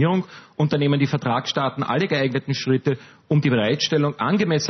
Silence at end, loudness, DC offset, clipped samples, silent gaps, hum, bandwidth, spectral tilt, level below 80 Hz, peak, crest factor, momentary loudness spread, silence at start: 0 s; -21 LUFS; under 0.1%; under 0.1%; none; none; 6.4 kHz; -6 dB/octave; -62 dBFS; -6 dBFS; 16 dB; 5 LU; 0 s